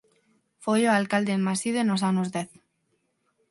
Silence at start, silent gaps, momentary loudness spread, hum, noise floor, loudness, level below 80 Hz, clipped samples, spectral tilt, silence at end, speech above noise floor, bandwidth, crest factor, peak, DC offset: 0.6 s; none; 12 LU; none; -73 dBFS; -25 LUFS; -72 dBFS; under 0.1%; -5 dB/octave; 1.05 s; 49 dB; 11.5 kHz; 18 dB; -8 dBFS; under 0.1%